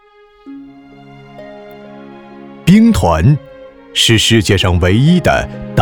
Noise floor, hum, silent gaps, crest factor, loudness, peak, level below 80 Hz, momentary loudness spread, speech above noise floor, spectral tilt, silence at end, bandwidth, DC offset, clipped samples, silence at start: -37 dBFS; none; none; 14 dB; -11 LUFS; 0 dBFS; -30 dBFS; 20 LU; 26 dB; -5 dB/octave; 0 s; 19 kHz; under 0.1%; under 0.1%; 0.45 s